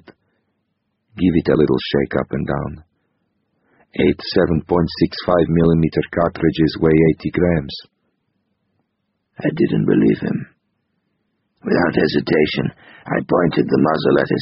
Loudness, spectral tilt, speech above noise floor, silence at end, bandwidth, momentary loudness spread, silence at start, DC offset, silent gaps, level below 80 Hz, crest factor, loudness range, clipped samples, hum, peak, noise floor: -17 LUFS; -6 dB/octave; 55 dB; 0 s; 5.8 kHz; 9 LU; 1.15 s; under 0.1%; none; -42 dBFS; 16 dB; 5 LU; under 0.1%; none; -2 dBFS; -72 dBFS